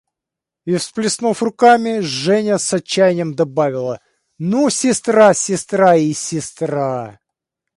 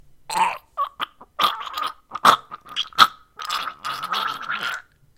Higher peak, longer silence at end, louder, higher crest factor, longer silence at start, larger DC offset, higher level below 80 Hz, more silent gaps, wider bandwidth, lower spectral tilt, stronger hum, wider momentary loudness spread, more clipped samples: about the same, 0 dBFS vs 0 dBFS; first, 0.65 s vs 0.35 s; first, -16 LUFS vs -22 LUFS; second, 16 dB vs 24 dB; first, 0.65 s vs 0.3 s; neither; about the same, -62 dBFS vs -62 dBFS; neither; second, 11.5 kHz vs 17 kHz; first, -4.5 dB/octave vs -1 dB/octave; neither; about the same, 12 LU vs 13 LU; neither